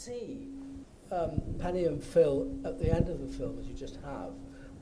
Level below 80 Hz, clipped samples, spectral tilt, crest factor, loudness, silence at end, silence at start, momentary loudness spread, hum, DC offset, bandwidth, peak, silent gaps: -44 dBFS; under 0.1%; -7.5 dB/octave; 22 dB; -33 LUFS; 0 s; 0 s; 17 LU; none; under 0.1%; 10.5 kHz; -12 dBFS; none